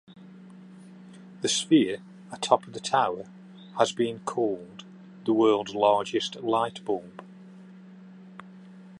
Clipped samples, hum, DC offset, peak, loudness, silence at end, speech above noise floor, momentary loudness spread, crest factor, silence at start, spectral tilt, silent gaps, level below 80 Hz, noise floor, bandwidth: under 0.1%; none; under 0.1%; -4 dBFS; -26 LUFS; 0 s; 22 dB; 26 LU; 24 dB; 0.1 s; -4 dB/octave; none; -74 dBFS; -48 dBFS; 11.5 kHz